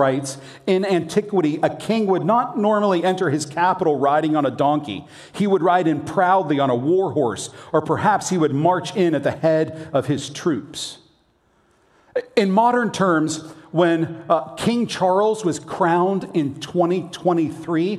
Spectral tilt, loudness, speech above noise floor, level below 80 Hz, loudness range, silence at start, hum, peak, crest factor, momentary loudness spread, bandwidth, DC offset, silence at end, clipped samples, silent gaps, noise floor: -6 dB/octave; -20 LUFS; 41 dB; -64 dBFS; 3 LU; 0 s; none; -2 dBFS; 18 dB; 7 LU; 13 kHz; under 0.1%; 0 s; under 0.1%; none; -61 dBFS